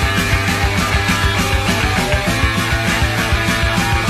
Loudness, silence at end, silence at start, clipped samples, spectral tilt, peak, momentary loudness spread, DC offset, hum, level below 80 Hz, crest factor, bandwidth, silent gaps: -15 LUFS; 0 s; 0 s; under 0.1%; -4 dB/octave; -2 dBFS; 1 LU; under 0.1%; none; -22 dBFS; 14 dB; 14.5 kHz; none